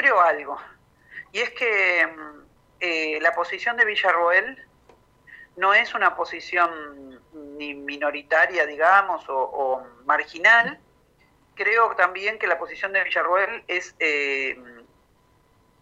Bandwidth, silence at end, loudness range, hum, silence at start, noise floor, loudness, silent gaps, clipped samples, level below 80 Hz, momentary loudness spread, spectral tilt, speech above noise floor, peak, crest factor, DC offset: 9.6 kHz; 1 s; 4 LU; none; 0 s; -61 dBFS; -21 LUFS; none; under 0.1%; -66 dBFS; 16 LU; -2.5 dB/octave; 38 dB; -4 dBFS; 20 dB; under 0.1%